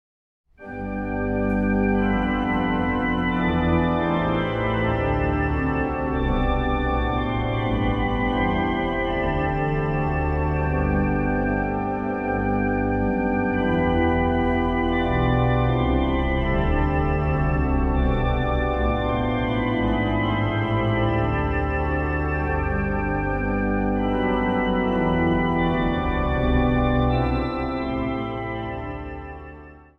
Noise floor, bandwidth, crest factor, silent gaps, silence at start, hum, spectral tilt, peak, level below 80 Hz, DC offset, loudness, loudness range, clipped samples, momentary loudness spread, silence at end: -43 dBFS; 5.6 kHz; 14 dB; none; 0.6 s; none; -9 dB/octave; -8 dBFS; -30 dBFS; under 0.1%; -23 LUFS; 2 LU; under 0.1%; 5 LU; 0.2 s